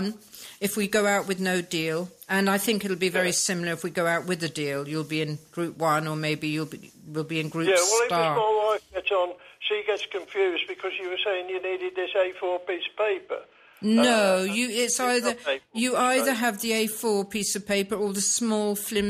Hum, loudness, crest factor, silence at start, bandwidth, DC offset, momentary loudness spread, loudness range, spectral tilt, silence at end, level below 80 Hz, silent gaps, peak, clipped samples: none; -25 LUFS; 16 dB; 0 s; 15.5 kHz; under 0.1%; 9 LU; 4 LU; -3.5 dB/octave; 0 s; -64 dBFS; none; -10 dBFS; under 0.1%